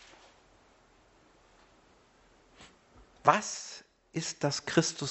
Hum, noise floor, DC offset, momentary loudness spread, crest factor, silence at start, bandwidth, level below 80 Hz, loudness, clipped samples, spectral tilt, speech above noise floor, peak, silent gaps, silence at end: none; -63 dBFS; under 0.1%; 15 LU; 30 dB; 2.6 s; 8.2 kHz; -68 dBFS; -30 LUFS; under 0.1%; -3.5 dB/octave; 34 dB; -6 dBFS; none; 0 s